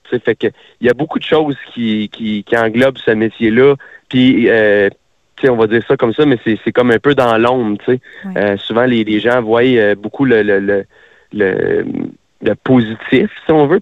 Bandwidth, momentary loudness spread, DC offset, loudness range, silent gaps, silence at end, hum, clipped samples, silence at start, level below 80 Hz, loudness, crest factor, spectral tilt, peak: 9 kHz; 9 LU; under 0.1%; 3 LU; none; 0 s; none; under 0.1%; 0.1 s; -48 dBFS; -13 LUFS; 12 dB; -7.5 dB/octave; 0 dBFS